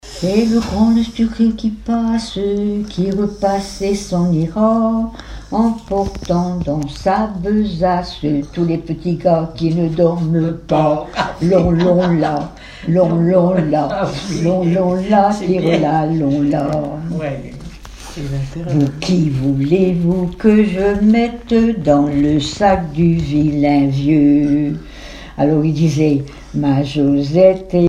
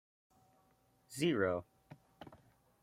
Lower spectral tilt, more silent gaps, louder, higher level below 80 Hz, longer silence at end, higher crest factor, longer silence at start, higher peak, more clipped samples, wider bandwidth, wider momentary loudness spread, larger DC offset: first, -7.5 dB/octave vs -5.5 dB/octave; neither; first, -16 LUFS vs -36 LUFS; first, -36 dBFS vs -78 dBFS; second, 0 s vs 0.45 s; second, 14 dB vs 22 dB; second, 0.05 s vs 1.1 s; first, 0 dBFS vs -20 dBFS; neither; second, 10 kHz vs 16 kHz; second, 9 LU vs 24 LU; neither